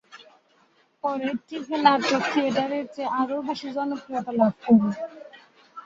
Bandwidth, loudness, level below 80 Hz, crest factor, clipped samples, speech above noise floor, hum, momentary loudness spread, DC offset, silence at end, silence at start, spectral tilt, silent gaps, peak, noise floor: 7.6 kHz; -24 LUFS; -70 dBFS; 22 dB; under 0.1%; 39 dB; none; 12 LU; under 0.1%; 0.05 s; 0.15 s; -5.5 dB/octave; none; -2 dBFS; -62 dBFS